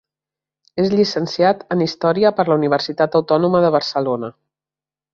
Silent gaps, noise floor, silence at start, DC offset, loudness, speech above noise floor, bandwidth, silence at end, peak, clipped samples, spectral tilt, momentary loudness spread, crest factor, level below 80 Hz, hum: none; under -90 dBFS; 0.75 s; under 0.1%; -17 LUFS; over 73 dB; 7.4 kHz; 0.8 s; -2 dBFS; under 0.1%; -6.5 dB/octave; 6 LU; 16 dB; -60 dBFS; none